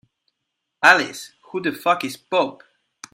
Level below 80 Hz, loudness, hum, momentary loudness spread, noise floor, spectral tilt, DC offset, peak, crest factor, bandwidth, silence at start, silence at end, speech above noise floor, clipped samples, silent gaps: -68 dBFS; -19 LUFS; none; 15 LU; -79 dBFS; -3 dB/octave; under 0.1%; 0 dBFS; 22 dB; 16 kHz; 0.8 s; 0.6 s; 59 dB; under 0.1%; none